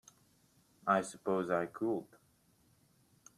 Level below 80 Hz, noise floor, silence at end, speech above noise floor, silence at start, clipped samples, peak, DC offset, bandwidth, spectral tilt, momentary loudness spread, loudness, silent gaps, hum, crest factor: -80 dBFS; -70 dBFS; 1.35 s; 36 dB; 0.85 s; under 0.1%; -16 dBFS; under 0.1%; 14 kHz; -6 dB/octave; 7 LU; -36 LUFS; none; none; 24 dB